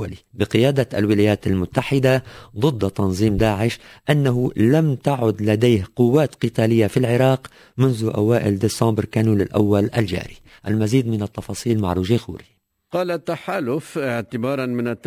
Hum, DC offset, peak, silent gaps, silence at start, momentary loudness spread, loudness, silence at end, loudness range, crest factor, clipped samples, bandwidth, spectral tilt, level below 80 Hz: none; under 0.1%; -2 dBFS; none; 0 s; 8 LU; -20 LUFS; 0.1 s; 5 LU; 18 dB; under 0.1%; 16 kHz; -7 dB/octave; -42 dBFS